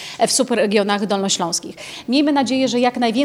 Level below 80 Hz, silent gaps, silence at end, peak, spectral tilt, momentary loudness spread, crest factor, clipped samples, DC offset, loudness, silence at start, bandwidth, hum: -64 dBFS; none; 0 s; -2 dBFS; -3 dB/octave; 6 LU; 16 dB; under 0.1%; under 0.1%; -18 LUFS; 0 s; 16 kHz; none